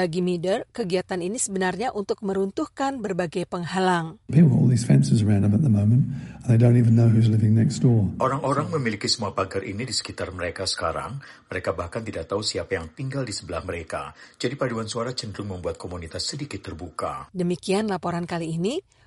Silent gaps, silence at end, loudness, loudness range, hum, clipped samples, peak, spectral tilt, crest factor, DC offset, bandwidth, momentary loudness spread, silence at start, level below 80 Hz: none; 0.25 s; -24 LUFS; 10 LU; none; under 0.1%; -6 dBFS; -6 dB/octave; 18 dB; under 0.1%; 11.5 kHz; 13 LU; 0 s; -52 dBFS